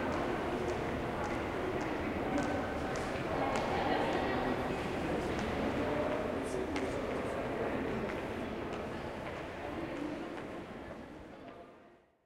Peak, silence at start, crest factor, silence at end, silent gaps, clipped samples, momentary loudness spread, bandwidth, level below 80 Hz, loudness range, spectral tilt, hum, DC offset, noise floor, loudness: -20 dBFS; 0 s; 16 dB; 0.3 s; none; under 0.1%; 11 LU; 16 kHz; -52 dBFS; 7 LU; -6 dB/octave; none; under 0.1%; -61 dBFS; -36 LUFS